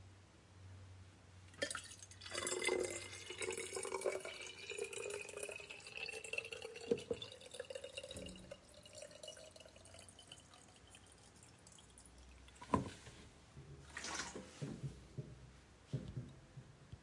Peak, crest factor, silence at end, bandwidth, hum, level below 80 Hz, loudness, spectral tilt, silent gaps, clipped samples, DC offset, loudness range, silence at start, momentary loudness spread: -20 dBFS; 28 dB; 0 s; 11.5 kHz; none; -68 dBFS; -46 LUFS; -3.5 dB/octave; none; under 0.1%; under 0.1%; 14 LU; 0 s; 19 LU